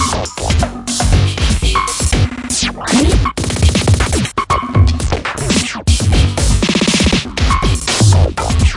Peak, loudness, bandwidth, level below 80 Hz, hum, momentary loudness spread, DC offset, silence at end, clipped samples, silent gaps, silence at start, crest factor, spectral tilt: 0 dBFS; -14 LUFS; 11.5 kHz; -18 dBFS; none; 5 LU; under 0.1%; 0 s; under 0.1%; none; 0 s; 12 dB; -4.5 dB/octave